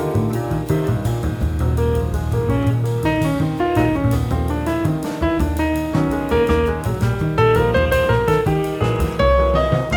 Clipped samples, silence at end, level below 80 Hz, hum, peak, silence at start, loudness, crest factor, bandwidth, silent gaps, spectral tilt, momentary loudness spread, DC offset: under 0.1%; 0 s; -26 dBFS; none; -4 dBFS; 0 s; -19 LUFS; 14 dB; 19.5 kHz; none; -7.5 dB/octave; 5 LU; under 0.1%